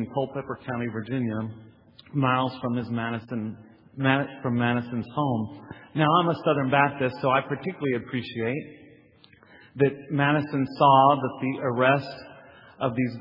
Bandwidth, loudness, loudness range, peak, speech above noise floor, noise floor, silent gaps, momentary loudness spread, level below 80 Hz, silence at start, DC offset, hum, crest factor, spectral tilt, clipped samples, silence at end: 5.6 kHz; -25 LUFS; 6 LU; -4 dBFS; 31 dB; -56 dBFS; none; 13 LU; -66 dBFS; 0 s; under 0.1%; none; 22 dB; -9.5 dB/octave; under 0.1%; 0 s